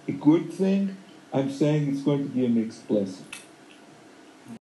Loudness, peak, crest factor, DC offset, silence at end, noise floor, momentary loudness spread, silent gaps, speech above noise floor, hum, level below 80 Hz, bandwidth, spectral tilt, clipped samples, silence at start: -25 LUFS; -8 dBFS; 18 dB; under 0.1%; 0.15 s; -50 dBFS; 20 LU; none; 26 dB; none; -74 dBFS; 12 kHz; -7.5 dB/octave; under 0.1%; 0.05 s